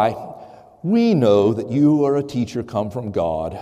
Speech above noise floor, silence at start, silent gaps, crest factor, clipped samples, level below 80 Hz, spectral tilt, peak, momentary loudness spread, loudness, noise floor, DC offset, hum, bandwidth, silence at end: 23 dB; 0 s; none; 14 dB; under 0.1%; -54 dBFS; -8 dB/octave; -4 dBFS; 10 LU; -19 LUFS; -41 dBFS; under 0.1%; none; 11.5 kHz; 0 s